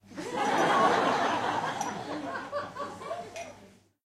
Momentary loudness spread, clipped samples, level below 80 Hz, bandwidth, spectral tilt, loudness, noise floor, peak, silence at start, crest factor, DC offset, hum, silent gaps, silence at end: 15 LU; under 0.1%; -68 dBFS; 15 kHz; -3.5 dB/octave; -29 LUFS; -56 dBFS; -12 dBFS; 0.1 s; 18 dB; under 0.1%; none; none; 0.4 s